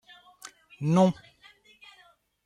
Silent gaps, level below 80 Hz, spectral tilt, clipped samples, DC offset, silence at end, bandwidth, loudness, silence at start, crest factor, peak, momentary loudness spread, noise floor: none; -68 dBFS; -7.5 dB/octave; under 0.1%; under 0.1%; 1.35 s; 11 kHz; -25 LUFS; 0.8 s; 20 dB; -12 dBFS; 25 LU; -61 dBFS